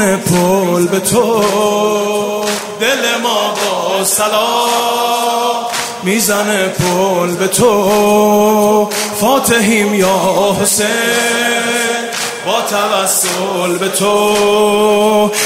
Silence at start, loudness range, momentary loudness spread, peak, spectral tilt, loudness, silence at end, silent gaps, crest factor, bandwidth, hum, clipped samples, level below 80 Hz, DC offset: 0 s; 2 LU; 5 LU; 0 dBFS; -3 dB/octave; -12 LUFS; 0 s; none; 12 dB; 16.5 kHz; none; under 0.1%; -50 dBFS; under 0.1%